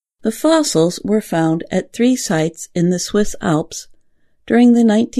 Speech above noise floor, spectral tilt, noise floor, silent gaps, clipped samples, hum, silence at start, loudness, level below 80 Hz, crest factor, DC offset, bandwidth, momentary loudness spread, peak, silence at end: 39 dB; -5.5 dB/octave; -54 dBFS; none; under 0.1%; none; 0.25 s; -16 LUFS; -44 dBFS; 16 dB; under 0.1%; 13.5 kHz; 9 LU; 0 dBFS; 0 s